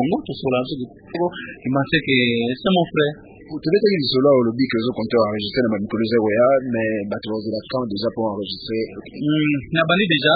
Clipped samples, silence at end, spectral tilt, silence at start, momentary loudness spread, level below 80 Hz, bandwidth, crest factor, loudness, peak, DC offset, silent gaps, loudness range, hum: under 0.1%; 0 s; -11 dB/octave; 0 s; 10 LU; -52 dBFS; 5 kHz; 16 dB; -20 LUFS; -4 dBFS; under 0.1%; none; 4 LU; none